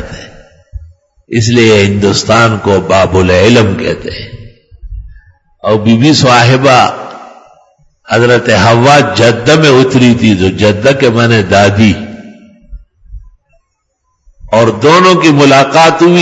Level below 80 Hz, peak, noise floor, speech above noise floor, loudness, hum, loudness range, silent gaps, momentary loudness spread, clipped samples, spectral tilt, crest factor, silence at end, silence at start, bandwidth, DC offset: -36 dBFS; 0 dBFS; -62 dBFS; 56 dB; -7 LUFS; none; 5 LU; none; 11 LU; 1%; -5.5 dB/octave; 8 dB; 0 s; 0 s; 11 kHz; under 0.1%